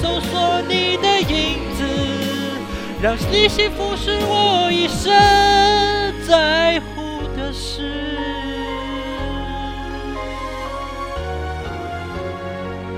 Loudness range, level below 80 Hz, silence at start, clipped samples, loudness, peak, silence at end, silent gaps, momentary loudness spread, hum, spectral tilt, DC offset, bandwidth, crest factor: 12 LU; -32 dBFS; 0 s; under 0.1%; -19 LUFS; 0 dBFS; 0 s; none; 14 LU; none; -4 dB/octave; under 0.1%; 16 kHz; 18 dB